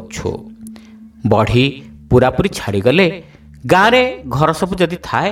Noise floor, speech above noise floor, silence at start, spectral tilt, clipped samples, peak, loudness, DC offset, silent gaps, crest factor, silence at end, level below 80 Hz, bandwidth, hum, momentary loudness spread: -38 dBFS; 24 dB; 0 s; -6 dB/octave; under 0.1%; 0 dBFS; -15 LUFS; under 0.1%; none; 16 dB; 0 s; -36 dBFS; 16 kHz; none; 20 LU